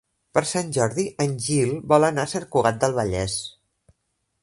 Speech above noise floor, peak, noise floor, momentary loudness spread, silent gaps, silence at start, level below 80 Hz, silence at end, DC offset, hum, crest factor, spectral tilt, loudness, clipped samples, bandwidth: 53 dB; -2 dBFS; -75 dBFS; 7 LU; none; 0.35 s; -48 dBFS; 0.9 s; under 0.1%; none; 22 dB; -5 dB/octave; -23 LUFS; under 0.1%; 11.5 kHz